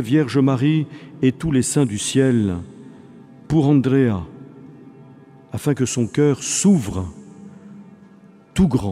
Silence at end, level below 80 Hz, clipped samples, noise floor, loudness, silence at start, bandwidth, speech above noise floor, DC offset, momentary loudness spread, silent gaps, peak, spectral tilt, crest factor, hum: 0 s; -44 dBFS; under 0.1%; -47 dBFS; -19 LUFS; 0 s; 14.5 kHz; 29 dB; under 0.1%; 16 LU; none; -4 dBFS; -6 dB/octave; 16 dB; none